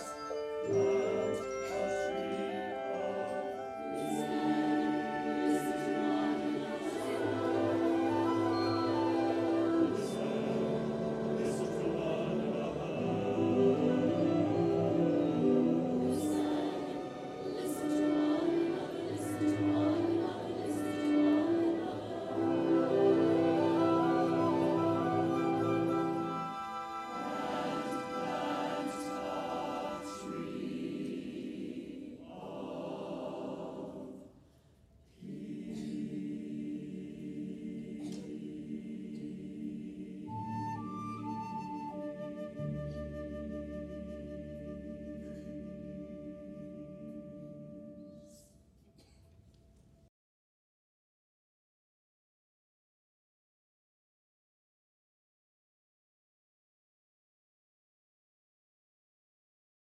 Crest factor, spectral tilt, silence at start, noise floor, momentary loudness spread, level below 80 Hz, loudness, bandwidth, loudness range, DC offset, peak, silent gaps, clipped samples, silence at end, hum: 18 dB; -6.5 dB/octave; 0 s; -63 dBFS; 15 LU; -64 dBFS; -34 LUFS; 13.5 kHz; 14 LU; under 0.1%; -16 dBFS; none; under 0.1%; 11.4 s; none